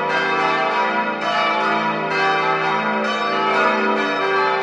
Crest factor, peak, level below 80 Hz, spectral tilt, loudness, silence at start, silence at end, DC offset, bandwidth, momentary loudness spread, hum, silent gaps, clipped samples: 16 dB; -4 dBFS; -70 dBFS; -4 dB/octave; -18 LUFS; 0 s; 0 s; under 0.1%; 10.5 kHz; 3 LU; none; none; under 0.1%